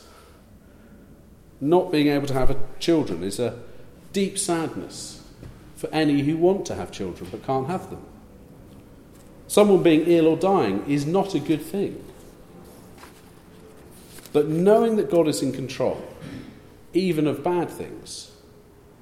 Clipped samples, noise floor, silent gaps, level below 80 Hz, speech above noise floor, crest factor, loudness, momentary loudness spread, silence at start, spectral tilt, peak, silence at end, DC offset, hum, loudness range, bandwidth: under 0.1%; -50 dBFS; none; -42 dBFS; 29 dB; 20 dB; -23 LUFS; 21 LU; 1.6 s; -6 dB/octave; -4 dBFS; 0.75 s; under 0.1%; none; 7 LU; 15.5 kHz